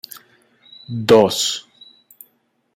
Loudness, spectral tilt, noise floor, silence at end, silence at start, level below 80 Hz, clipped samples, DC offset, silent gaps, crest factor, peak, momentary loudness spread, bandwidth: -16 LUFS; -4 dB/octave; -63 dBFS; 1.15 s; 0.9 s; -58 dBFS; under 0.1%; under 0.1%; none; 18 dB; -2 dBFS; 24 LU; 16 kHz